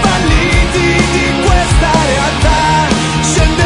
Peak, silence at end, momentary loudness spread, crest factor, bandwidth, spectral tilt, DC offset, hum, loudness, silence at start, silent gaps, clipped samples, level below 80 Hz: 0 dBFS; 0 s; 2 LU; 10 dB; 11 kHz; -4.5 dB/octave; under 0.1%; none; -11 LUFS; 0 s; none; under 0.1%; -16 dBFS